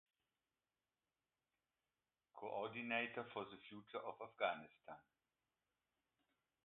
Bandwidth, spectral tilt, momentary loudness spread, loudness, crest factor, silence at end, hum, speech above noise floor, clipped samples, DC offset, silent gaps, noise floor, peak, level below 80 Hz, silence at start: 4 kHz; -1.5 dB/octave; 18 LU; -47 LUFS; 26 dB; 1.65 s; none; over 42 dB; under 0.1%; under 0.1%; none; under -90 dBFS; -26 dBFS; under -90 dBFS; 2.35 s